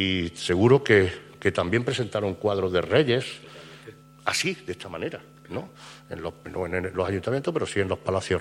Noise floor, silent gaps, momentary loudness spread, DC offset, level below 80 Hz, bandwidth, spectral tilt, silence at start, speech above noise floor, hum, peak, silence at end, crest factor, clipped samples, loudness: -47 dBFS; none; 19 LU; under 0.1%; -54 dBFS; 15 kHz; -5 dB/octave; 0 s; 22 dB; none; -6 dBFS; 0 s; 20 dB; under 0.1%; -25 LUFS